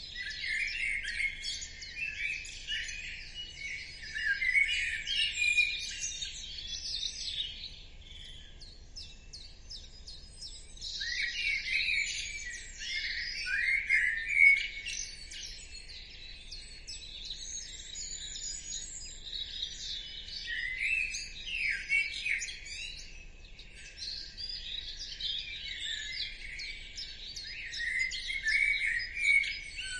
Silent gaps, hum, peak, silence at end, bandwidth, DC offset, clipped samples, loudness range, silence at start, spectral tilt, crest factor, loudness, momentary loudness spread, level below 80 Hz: none; none; -12 dBFS; 0 s; 11.5 kHz; under 0.1%; under 0.1%; 12 LU; 0 s; 1 dB/octave; 24 dB; -32 LUFS; 20 LU; -52 dBFS